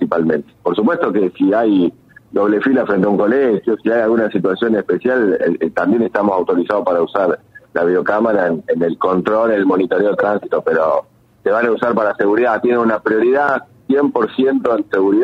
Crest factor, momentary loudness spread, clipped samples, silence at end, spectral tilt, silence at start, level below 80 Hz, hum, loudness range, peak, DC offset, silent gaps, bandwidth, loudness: 14 dB; 4 LU; under 0.1%; 0 s; -8.5 dB/octave; 0 s; -58 dBFS; none; 1 LU; 0 dBFS; under 0.1%; none; 6.2 kHz; -16 LUFS